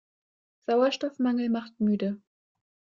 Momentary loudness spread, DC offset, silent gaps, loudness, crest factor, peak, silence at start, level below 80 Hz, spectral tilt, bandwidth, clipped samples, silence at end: 10 LU; under 0.1%; none; -27 LUFS; 16 dB; -14 dBFS; 0.7 s; -74 dBFS; -6.5 dB/octave; 7.4 kHz; under 0.1%; 0.8 s